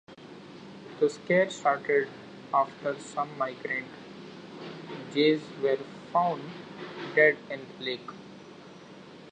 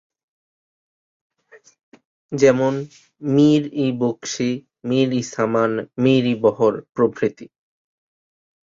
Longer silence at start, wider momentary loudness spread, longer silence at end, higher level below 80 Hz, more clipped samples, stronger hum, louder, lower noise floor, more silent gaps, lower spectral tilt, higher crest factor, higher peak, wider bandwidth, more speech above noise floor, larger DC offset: second, 0.1 s vs 1.55 s; first, 23 LU vs 9 LU; second, 0 s vs 1.2 s; second, -76 dBFS vs -62 dBFS; neither; neither; second, -28 LUFS vs -19 LUFS; second, -48 dBFS vs -52 dBFS; second, none vs 1.83-1.92 s, 2.05-2.29 s, 6.89-6.93 s; about the same, -5 dB/octave vs -6 dB/octave; about the same, 22 dB vs 18 dB; second, -8 dBFS vs -2 dBFS; first, 9.2 kHz vs 7.6 kHz; second, 20 dB vs 33 dB; neither